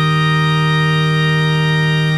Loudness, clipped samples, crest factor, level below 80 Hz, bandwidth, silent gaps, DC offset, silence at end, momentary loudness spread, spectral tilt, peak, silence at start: -14 LUFS; under 0.1%; 10 dB; -42 dBFS; 12 kHz; none; under 0.1%; 0 s; 1 LU; -6 dB/octave; -4 dBFS; 0 s